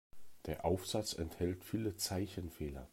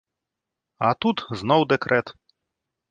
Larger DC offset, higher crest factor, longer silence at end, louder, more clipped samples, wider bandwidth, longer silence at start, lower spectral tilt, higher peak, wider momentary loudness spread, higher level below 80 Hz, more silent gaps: neither; about the same, 18 dB vs 20 dB; second, 0.05 s vs 0.8 s; second, -40 LUFS vs -22 LUFS; neither; first, 16 kHz vs 9.2 kHz; second, 0.15 s vs 0.8 s; second, -5 dB/octave vs -6.5 dB/octave; second, -22 dBFS vs -4 dBFS; about the same, 8 LU vs 7 LU; about the same, -58 dBFS vs -60 dBFS; neither